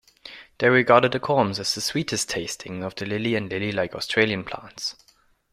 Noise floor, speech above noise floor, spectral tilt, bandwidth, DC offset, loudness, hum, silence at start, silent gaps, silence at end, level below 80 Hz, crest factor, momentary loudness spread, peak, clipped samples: -45 dBFS; 22 dB; -4 dB/octave; 15.5 kHz; under 0.1%; -23 LUFS; none; 0.25 s; none; 0.6 s; -58 dBFS; 22 dB; 14 LU; -2 dBFS; under 0.1%